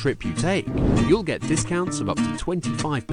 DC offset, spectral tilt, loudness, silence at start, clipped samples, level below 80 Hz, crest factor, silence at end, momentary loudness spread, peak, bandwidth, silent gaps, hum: under 0.1%; -5.5 dB/octave; -23 LUFS; 0 s; under 0.1%; -36 dBFS; 16 dB; 0 s; 5 LU; -8 dBFS; 11 kHz; none; none